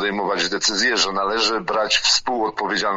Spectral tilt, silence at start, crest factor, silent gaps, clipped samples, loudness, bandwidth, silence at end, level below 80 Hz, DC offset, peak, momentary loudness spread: -1 dB/octave; 0 s; 16 dB; none; under 0.1%; -19 LUFS; 9.6 kHz; 0 s; -52 dBFS; under 0.1%; -4 dBFS; 6 LU